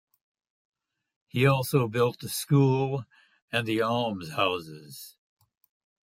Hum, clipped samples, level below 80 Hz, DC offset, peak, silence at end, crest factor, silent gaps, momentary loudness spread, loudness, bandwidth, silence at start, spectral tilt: none; under 0.1%; -68 dBFS; under 0.1%; -8 dBFS; 0.95 s; 20 dB; 3.42-3.48 s; 20 LU; -27 LUFS; 16 kHz; 1.35 s; -5.5 dB/octave